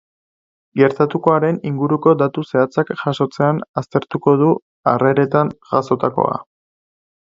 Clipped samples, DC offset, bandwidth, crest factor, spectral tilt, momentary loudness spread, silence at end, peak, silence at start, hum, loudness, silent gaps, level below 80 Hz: under 0.1%; under 0.1%; 7.6 kHz; 18 dB; -8.5 dB/octave; 6 LU; 0.8 s; 0 dBFS; 0.75 s; none; -17 LUFS; 3.69-3.74 s, 4.62-4.84 s; -60 dBFS